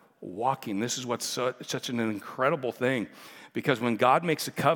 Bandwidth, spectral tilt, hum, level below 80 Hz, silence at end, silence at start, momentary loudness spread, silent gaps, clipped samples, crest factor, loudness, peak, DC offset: 18 kHz; -4.5 dB/octave; none; -80 dBFS; 0 s; 0.2 s; 10 LU; none; under 0.1%; 22 dB; -28 LUFS; -6 dBFS; under 0.1%